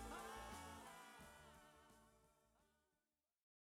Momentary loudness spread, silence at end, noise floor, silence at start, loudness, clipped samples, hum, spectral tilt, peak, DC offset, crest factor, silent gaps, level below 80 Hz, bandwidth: 14 LU; 0.95 s; under -90 dBFS; 0 s; -58 LUFS; under 0.1%; none; -3.5 dB/octave; -42 dBFS; under 0.1%; 18 dB; none; -70 dBFS; 17 kHz